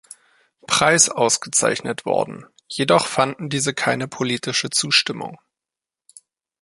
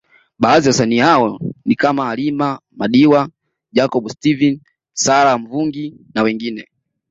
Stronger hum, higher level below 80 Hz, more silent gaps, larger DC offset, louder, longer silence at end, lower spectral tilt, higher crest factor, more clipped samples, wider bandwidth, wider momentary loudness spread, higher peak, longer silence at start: neither; second, -62 dBFS vs -54 dBFS; neither; neither; second, -19 LUFS vs -15 LUFS; first, 1.25 s vs 0.5 s; second, -2 dB/octave vs -4.5 dB/octave; first, 20 dB vs 14 dB; neither; first, 12 kHz vs 7.8 kHz; about the same, 12 LU vs 12 LU; about the same, -2 dBFS vs -2 dBFS; first, 0.7 s vs 0.4 s